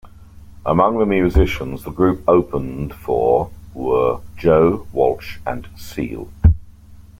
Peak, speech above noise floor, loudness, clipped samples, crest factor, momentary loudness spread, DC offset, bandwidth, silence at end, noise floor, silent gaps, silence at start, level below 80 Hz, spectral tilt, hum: -2 dBFS; 24 dB; -18 LUFS; under 0.1%; 16 dB; 13 LU; under 0.1%; 16 kHz; 0.2 s; -41 dBFS; none; 0.05 s; -28 dBFS; -8.5 dB/octave; none